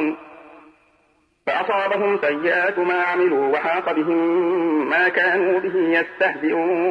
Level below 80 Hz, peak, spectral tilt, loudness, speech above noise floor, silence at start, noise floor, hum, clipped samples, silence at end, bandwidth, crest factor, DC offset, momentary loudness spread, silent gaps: -70 dBFS; -6 dBFS; -6.5 dB/octave; -19 LUFS; 43 dB; 0 s; -62 dBFS; none; under 0.1%; 0 s; 5.4 kHz; 14 dB; under 0.1%; 4 LU; none